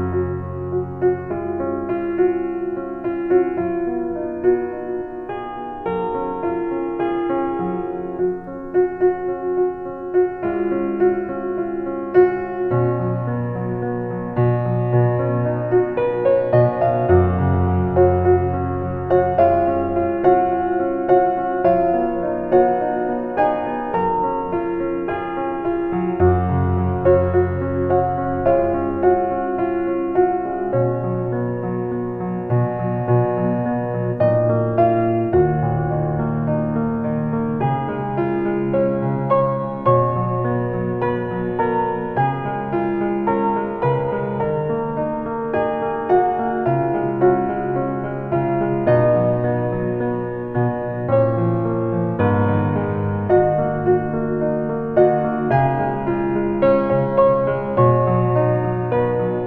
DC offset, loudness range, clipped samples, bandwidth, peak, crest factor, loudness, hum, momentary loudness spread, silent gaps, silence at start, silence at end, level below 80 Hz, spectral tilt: under 0.1%; 4 LU; under 0.1%; 3.9 kHz; -2 dBFS; 16 dB; -20 LUFS; none; 8 LU; none; 0 s; 0 s; -42 dBFS; -11.5 dB/octave